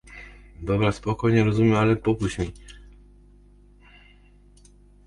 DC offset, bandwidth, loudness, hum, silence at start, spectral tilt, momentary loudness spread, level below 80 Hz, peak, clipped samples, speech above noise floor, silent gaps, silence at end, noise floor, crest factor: under 0.1%; 11 kHz; -23 LUFS; 50 Hz at -45 dBFS; 0.1 s; -7.5 dB/octave; 24 LU; -44 dBFS; -8 dBFS; under 0.1%; 31 dB; none; 2.3 s; -53 dBFS; 18 dB